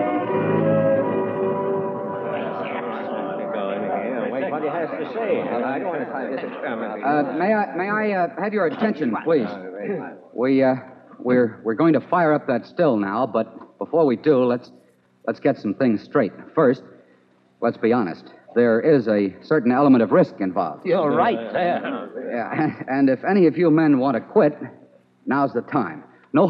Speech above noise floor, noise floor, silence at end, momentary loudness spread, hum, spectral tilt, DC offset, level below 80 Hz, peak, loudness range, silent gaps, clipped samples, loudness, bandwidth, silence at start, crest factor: 37 dB; -57 dBFS; 0 s; 10 LU; none; -9.5 dB/octave; under 0.1%; -76 dBFS; -4 dBFS; 6 LU; none; under 0.1%; -21 LUFS; 5.8 kHz; 0 s; 16 dB